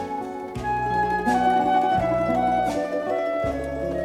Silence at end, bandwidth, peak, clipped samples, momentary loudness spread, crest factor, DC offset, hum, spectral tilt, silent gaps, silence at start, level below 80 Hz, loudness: 0 s; 14 kHz; -8 dBFS; under 0.1%; 9 LU; 14 dB; under 0.1%; none; -6.5 dB/octave; none; 0 s; -44 dBFS; -23 LUFS